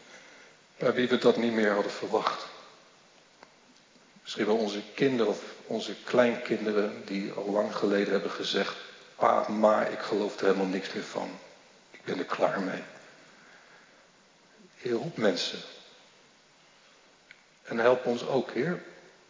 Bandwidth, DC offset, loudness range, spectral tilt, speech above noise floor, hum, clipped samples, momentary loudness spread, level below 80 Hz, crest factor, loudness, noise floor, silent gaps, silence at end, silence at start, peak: 7.6 kHz; under 0.1%; 7 LU; -5 dB/octave; 32 dB; none; under 0.1%; 17 LU; -82 dBFS; 22 dB; -29 LUFS; -60 dBFS; none; 0.3 s; 0.1 s; -8 dBFS